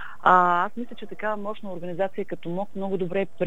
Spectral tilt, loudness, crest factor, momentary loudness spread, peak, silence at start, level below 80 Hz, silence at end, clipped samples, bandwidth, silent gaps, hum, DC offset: -7.5 dB/octave; -25 LUFS; 22 dB; 16 LU; -2 dBFS; 0 s; -64 dBFS; 0 s; under 0.1%; 9.8 kHz; none; none; 2%